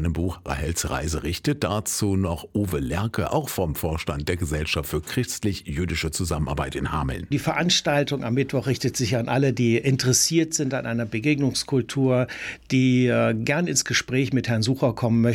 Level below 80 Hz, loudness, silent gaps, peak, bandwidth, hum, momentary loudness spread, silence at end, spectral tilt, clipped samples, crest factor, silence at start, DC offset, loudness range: -40 dBFS; -24 LUFS; none; -8 dBFS; 18.5 kHz; none; 7 LU; 0 s; -4.5 dB/octave; under 0.1%; 16 dB; 0 s; under 0.1%; 4 LU